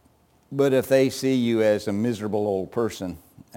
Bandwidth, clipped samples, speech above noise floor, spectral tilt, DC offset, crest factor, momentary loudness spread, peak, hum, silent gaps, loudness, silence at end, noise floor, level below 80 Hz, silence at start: 17 kHz; under 0.1%; 38 dB; -6 dB/octave; under 0.1%; 16 dB; 14 LU; -8 dBFS; none; none; -23 LUFS; 0.4 s; -60 dBFS; -60 dBFS; 0.5 s